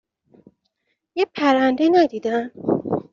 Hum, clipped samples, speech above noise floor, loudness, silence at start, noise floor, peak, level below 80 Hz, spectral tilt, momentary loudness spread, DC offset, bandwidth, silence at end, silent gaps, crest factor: none; under 0.1%; 54 dB; -20 LUFS; 1.15 s; -73 dBFS; -4 dBFS; -64 dBFS; -4 dB/octave; 8 LU; under 0.1%; 7.2 kHz; 0.1 s; none; 18 dB